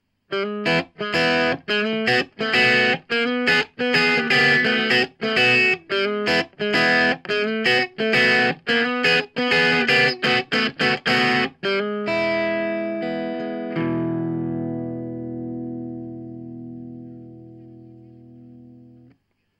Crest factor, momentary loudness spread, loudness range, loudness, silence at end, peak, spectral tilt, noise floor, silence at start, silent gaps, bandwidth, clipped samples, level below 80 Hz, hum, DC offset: 16 dB; 15 LU; 14 LU; -19 LUFS; 0.9 s; -4 dBFS; -4.5 dB/octave; -61 dBFS; 0.3 s; none; 13 kHz; under 0.1%; -62 dBFS; 50 Hz at -60 dBFS; under 0.1%